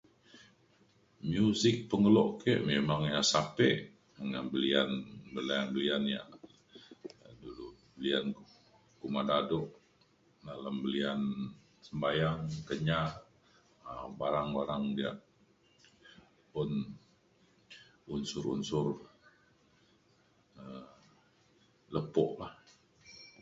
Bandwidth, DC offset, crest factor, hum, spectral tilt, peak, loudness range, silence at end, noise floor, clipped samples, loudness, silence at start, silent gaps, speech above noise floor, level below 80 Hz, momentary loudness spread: 7.6 kHz; under 0.1%; 22 dB; none; -4.5 dB/octave; -12 dBFS; 11 LU; 0.15 s; -69 dBFS; under 0.1%; -33 LUFS; 0.35 s; none; 37 dB; -64 dBFS; 22 LU